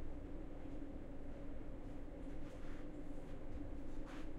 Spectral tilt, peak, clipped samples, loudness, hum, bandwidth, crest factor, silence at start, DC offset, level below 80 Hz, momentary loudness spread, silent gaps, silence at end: -7.5 dB/octave; -34 dBFS; under 0.1%; -53 LUFS; none; 7.2 kHz; 10 dB; 0 s; under 0.1%; -50 dBFS; 2 LU; none; 0 s